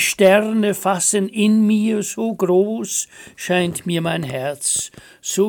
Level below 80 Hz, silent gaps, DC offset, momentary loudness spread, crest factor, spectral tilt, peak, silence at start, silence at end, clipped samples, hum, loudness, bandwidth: -60 dBFS; none; under 0.1%; 10 LU; 16 dB; -4 dB/octave; -2 dBFS; 0 s; 0 s; under 0.1%; none; -18 LUFS; 17 kHz